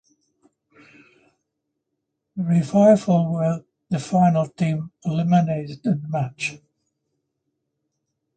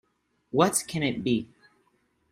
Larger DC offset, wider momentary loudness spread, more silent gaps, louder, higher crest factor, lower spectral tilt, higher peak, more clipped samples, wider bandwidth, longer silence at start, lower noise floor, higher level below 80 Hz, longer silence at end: neither; first, 13 LU vs 7 LU; neither; first, -21 LUFS vs -26 LUFS; second, 18 dB vs 24 dB; first, -8 dB/octave vs -4.5 dB/octave; about the same, -4 dBFS vs -6 dBFS; neither; second, 9 kHz vs 15 kHz; first, 2.35 s vs 0.55 s; first, -79 dBFS vs -70 dBFS; about the same, -62 dBFS vs -62 dBFS; first, 1.8 s vs 0.85 s